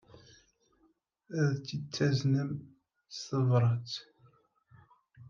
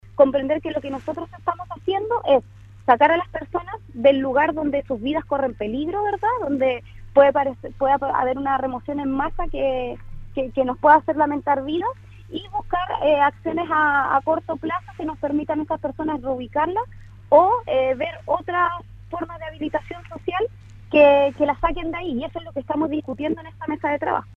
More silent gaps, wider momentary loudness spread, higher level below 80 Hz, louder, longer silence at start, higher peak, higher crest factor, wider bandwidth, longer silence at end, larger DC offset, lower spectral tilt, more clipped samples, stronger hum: neither; about the same, 15 LU vs 13 LU; second, -74 dBFS vs -42 dBFS; second, -32 LUFS vs -22 LUFS; about the same, 0.15 s vs 0.05 s; second, -16 dBFS vs -2 dBFS; about the same, 18 dB vs 20 dB; first, 7.2 kHz vs 5.6 kHz; about the same, 0.05 s vs 0 s; neither; about the same, -6.5 dB/octave vs -7.5 dB/octave; neither; neither